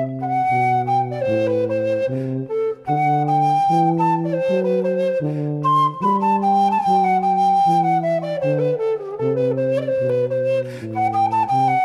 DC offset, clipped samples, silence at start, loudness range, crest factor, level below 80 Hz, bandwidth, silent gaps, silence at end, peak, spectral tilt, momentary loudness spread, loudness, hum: under 0.1%; under 0.1%; 0 s; 3 LU; 12 dB; -64 dBFS; 11.5 kHz; none; 0 s; -6 dBFS; -8 dB/octave; 6 LU; -19 LUFS; none